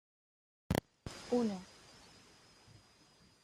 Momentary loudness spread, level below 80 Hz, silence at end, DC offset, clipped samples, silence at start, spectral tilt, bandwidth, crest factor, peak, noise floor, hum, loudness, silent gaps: 26 LU; -60 dBFS; 1.8 s; under 0.1%; under 0.1%; 0.7 s; -6 dB/octave; 13.5 kHz; 26 dB; -18 dBFS; -66 dBFS; none; -39 LUFS; none